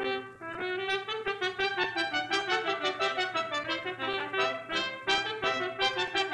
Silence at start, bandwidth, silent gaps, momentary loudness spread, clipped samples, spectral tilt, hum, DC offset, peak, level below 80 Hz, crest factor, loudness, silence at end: 0 s; 11 kHz; none; 5 LU; under 0.1%; -2.5 dB/octave; none; under 0.1%; -14 dBFS; -66 dBFS; 16 dB; -30 LUFS; 0 s